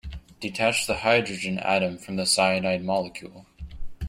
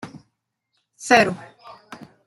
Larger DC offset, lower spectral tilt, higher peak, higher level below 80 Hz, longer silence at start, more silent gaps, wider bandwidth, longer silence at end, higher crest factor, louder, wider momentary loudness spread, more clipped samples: neither; about the same, -3.5 dB/octave vs -3.5 dB/octave; second, -6 dBFS vs -2 dBFS; first, -44 dBFS vs -62 dBFS; about the same, 0.05 s vs 0.05 s; neither; about the same, 16 kHz vs 15 kHz; second, 0 s vs 0.2 s; about the same, 20 dB vs 22 dB; second, -24 LUFS vs -18 LUFS; second, 21 LU vs 25 LU; neither